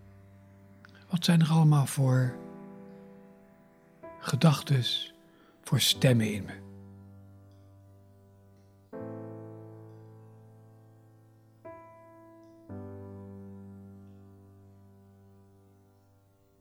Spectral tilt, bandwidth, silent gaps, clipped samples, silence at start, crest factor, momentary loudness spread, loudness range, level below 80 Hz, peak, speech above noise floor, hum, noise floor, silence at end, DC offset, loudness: -5.5 dB/octave; 15.5 kHz; none; under 0.1%; 1.1 s; 22 dB; 27 LU; 22 LU; -72 dBFS; -10 dBFS; 39 dB; none; -64 dBFS; 2.65 s; under 0.1%; -27 LUFS